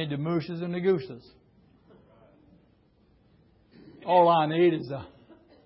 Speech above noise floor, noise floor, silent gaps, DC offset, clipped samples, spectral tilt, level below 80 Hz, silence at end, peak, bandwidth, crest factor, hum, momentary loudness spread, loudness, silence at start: 38 dB; -63 dBFS; none; under 0.1%; under 0.1%; -11 dB/octave; -66 dBFS; 0.6 s; -8 dBFS; 5.8 kHz; 20 dB; none; 21 LU; -25 LUFS; 0 s